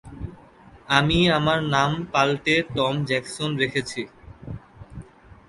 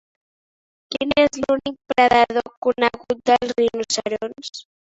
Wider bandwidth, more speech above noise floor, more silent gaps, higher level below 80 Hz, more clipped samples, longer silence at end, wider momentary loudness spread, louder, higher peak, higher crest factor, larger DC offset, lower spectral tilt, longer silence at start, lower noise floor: first, 11.5 kHz vs 8 kHz; second, 27 dB vs over 70 dB; second, none vs 2.57-2.62 s; first, -46 dBFS vs -54 dBFS; neither; first, 0.45 s vs 0.25 s; first, 22 LU vs 13 LU; about the same, -22 LUFS vs -20 LUFS; about the same, -2 dBFS vs -2 dBFS; about the same, 22 dB vs 20 dB; neither; first, -5 dB/octave vs -3 dB/octave; second, 0.05 s vs 0.9 s; second, -49 dBFS vs under -90 dBFS